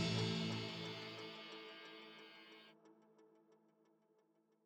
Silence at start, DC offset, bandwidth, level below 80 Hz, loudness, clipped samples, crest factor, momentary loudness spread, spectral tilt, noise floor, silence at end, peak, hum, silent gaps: 0 s; under 0.1%; 11 kHz; -78 dBFS; -46 LUFS; under 0.1%; 20 dB; 20 LU; -5 dB/octave; -78 dBFS; 1.1 s; -28 dBFS; none; none